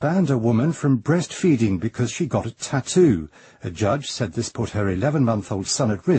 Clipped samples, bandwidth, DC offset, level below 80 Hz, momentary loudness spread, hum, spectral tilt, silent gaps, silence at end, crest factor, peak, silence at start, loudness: under 0.1%; 8.8 kHz; under 0.1%; -50 dBFS; 7 LU; none; -6 dB/octave; none; 0 s; 16 dB; -6 dBFS; 0 s; -22 LUFS